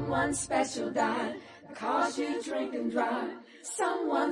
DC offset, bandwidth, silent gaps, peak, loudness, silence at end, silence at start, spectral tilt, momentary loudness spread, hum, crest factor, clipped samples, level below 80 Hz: under 0.1%; 11.5 kHz; none; -14 dBFS; -31 LUFS; 0 s; 0 s; -4 dB/octave; 10 LU; none; 16 dB; under 0.1%; -64 dBFS